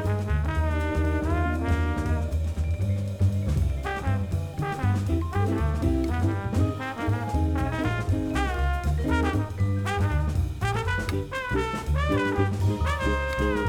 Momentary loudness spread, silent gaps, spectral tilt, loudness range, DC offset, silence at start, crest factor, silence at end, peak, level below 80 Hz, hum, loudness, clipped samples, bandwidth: 3 LU; none; -7 dB/octave; 1 LU; under 0.1%; 0 s; 14 dB; 0 s; -12 dBFS; -32 dBFS; none; -27 LUFS; under 0.1%; 14.5 kHz